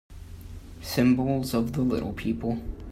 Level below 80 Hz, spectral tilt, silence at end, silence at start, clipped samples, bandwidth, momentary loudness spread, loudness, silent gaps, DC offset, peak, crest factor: -42 dBFS; -6.5 dB/octave; 0 s; 0.1 s; under 0.1%; 16 kHz; 21 LU; -27 LUFS; none; under 0.1%; -10 dBFS; 18 dB